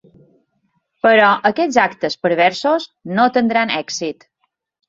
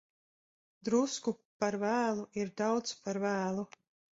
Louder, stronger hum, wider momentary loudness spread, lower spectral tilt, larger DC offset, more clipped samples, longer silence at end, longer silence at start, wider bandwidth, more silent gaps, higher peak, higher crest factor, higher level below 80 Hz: first, -16 LUFS vs -34 LUFS; neither; first, 11 LU vs 8 LU; about the same, -4 dB/octave vs -4.5 dB/octave; neither; neither; first, 0.75 s vs 0.5 s; first, 1.05 s vs 0.85 s; about the same, 7.8 kHz vs 8 kHz; second, none vs 1.45-1.60 s; first, -2 dBFS vs -16 dBFS; about the same, 16 dB vs 18 dB; first, -62 dBFS vs -76 dBFS